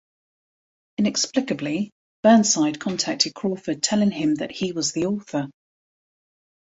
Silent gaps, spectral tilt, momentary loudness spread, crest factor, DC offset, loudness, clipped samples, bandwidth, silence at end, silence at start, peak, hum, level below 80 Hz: 1.92-2.23 s; -3.5 dB/octave; 12 LU; 22 dB; under 0.1%; -22 LUFS; under 0.1%; 8.2 kHz; 1.15 s; 1 s; -2 dBFS; none; -64 dBFS